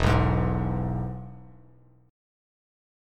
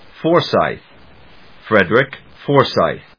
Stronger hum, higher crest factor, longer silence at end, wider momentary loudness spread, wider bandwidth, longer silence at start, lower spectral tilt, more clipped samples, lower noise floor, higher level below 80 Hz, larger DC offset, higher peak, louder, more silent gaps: neither; about the same, 20 dB vs 18 dB; first, 1.6 s vs 0.2 s; first, 21 LU vs 9 LU; first, 10 kHz vs 5.4 kHz; second, 0 s vs 0.2 s; about the same, -7.5 dB/octave vs -7 dB/octave; neither; first, -56 dBFS vs -45 dBFS; first, -36 dBFS vs -50 dBFS; second, under 0.1% vs 0.3%; second, -8 dBFS vs 0 dBFS; second, -27 LUFS vs -16 LUFS; neither